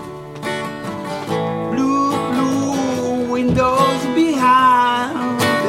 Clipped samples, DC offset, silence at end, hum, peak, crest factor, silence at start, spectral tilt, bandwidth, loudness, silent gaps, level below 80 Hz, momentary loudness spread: under 0.1%; under 0.1%; 0 s; none; -2 dBFS; 14 dB; 0 s; -5 dB/octave; 16.5 kHz; -17 LUFS; none; -46 dBFS; 13 LU